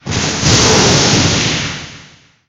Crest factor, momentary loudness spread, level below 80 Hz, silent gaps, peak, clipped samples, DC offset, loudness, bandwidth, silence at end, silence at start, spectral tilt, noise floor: 14 dB; 14 LU; -32 dBFS; none; 0 dBFS; under 0.1%; under 0.1%; -11 LUFS; 16.5 kHz; 0.45 s; 0.05 s; -3 dB/octave; -42 dBFS